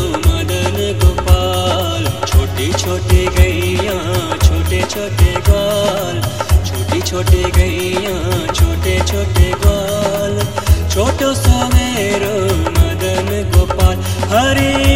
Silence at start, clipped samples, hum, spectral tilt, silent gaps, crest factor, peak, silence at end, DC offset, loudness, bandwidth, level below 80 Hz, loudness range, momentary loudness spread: 0 s; under 0.1%; none; -5 dB/octave; none; 14 dB; 0 dBFS; 0 s; 2%; -14 LUFS; 16.5 kHz; -18 dBFS; 1 LU; 5 LU